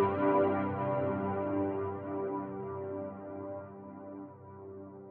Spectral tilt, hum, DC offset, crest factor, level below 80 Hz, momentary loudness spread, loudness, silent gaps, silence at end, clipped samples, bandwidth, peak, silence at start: -8 dB/octave; none; under 0.1%; 18 dB; -70 dBFS; 19 LU; -34 LUFS; none; 0 s; under 0.1%; 4.2 kHz; -18 dBFS; 0 s